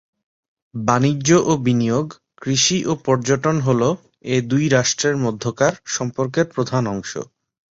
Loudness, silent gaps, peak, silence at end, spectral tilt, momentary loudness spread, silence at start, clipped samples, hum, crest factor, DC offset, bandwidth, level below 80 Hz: -19 LUFS; none; -2 dBFS; 0.5 s; -4.5 dB/octave; 12 LU; 0.75 s; under 0.1%; none; 18 dB; under 0.1%; 8 kHz; -54 dBFS